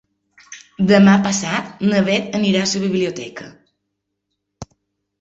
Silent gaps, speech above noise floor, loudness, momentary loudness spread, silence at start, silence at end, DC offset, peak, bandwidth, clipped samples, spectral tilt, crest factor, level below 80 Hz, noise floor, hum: none; 60 dB; -16 LUFS; 21 LU; 0.5 s; 0.55 s; under 0.1%; -2 dBFS; 8 kHz; under 0.1%; -5 dB/octave; 16 dB; -56 dBFS; -76 dBFS; none